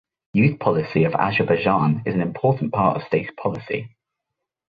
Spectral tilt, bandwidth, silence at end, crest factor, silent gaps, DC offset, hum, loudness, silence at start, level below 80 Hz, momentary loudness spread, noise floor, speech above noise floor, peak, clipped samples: -10 dB/octave; 5 kHz; 0.85 s; 18 dB; none; under 0.1%; none; -21 LUFS; 0.35 s; -54 dBFS; 9 LU; -82 dBFS; 62 dB; -2 dBFS; under 0.1%